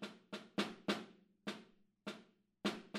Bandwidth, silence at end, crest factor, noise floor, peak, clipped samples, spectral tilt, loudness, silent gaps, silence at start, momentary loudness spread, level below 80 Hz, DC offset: 15.5 kHz; 0 s; 24 dB; -65 dBFS; -22 dBFS; under 0.1%; -4.5 dB/octave; -45 LUFS; none; 0 s; 13 LU; -86 dBFS; under 0.1%